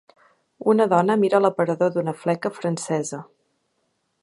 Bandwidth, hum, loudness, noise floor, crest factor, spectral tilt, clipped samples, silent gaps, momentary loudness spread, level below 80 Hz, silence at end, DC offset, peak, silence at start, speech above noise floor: 11.5 kHz; none; -22 LUFS; -72 dBFS; 20 dB; -6 dB/octave; under 0.1%; none; 9 LU; -74 dBFS; 1 s; under 0.1%; -4 dBFS; 0.65 s; 51 dB